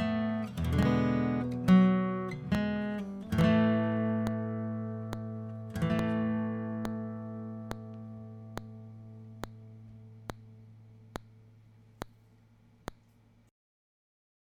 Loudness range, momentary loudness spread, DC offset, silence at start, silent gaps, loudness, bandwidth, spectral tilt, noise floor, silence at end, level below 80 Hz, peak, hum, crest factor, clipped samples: 23 LU; 22 LU; under 0.1%; 0 s; none; -31 LUFS; 14 kHz; -8 dB/octave; -63 dBFS; 1.65 s; -52 dBFS; -12 dBFS; none; 20 dB; under 0.1%